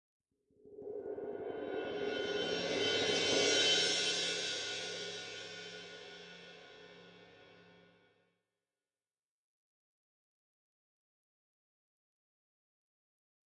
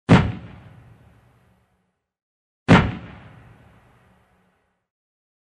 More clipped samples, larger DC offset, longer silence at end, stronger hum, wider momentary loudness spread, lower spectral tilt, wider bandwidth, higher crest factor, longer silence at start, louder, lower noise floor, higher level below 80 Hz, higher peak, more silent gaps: neither; neither; first, 5.85 s vs 2.45 s; neither; about the same, 23 LU vs 25 LU; second, -1.5 dB/octave vs -7 dB/octave; first, 11 kHz vs 9.8 kHz; about the same, 22 dB vs 22 dB; first, 0.65 s vs 0.1 s; second, -34 LUFS vs -18 LUFS; first, under -90 dBFS vs -71 dBFS; second, -80 dBFS vs -40 dBFS; second, -18 dBFS vs -2 dBFS; second, none vs 2.22-2.66 s